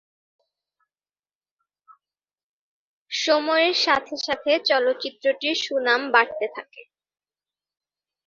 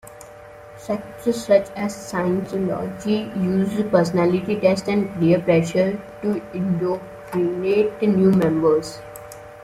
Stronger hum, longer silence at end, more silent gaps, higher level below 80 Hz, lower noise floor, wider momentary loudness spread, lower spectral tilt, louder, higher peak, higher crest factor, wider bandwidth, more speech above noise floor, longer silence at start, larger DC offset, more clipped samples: first, 50 Hz at -80 dBFS vs none; first, 1.45 s vs 0 s; neither; second, -72 dBFS vs -52 dBFS; first, under -90 dBFS vs -41 dBFS; second, 10 LU vs 16 LU; second, -1 dB/octave vs -7 dB/octave; about the same, -22 LUFS vs -21 LUFS; about the same, -2 dBFS vs -4 dBFS; first, 24 dB vs 18 dB; second, 7.6 kHz vs 15 kHz; first, over 68 dB vs 21 dB; first, 3.1 s vs 0.05 s; neither; neither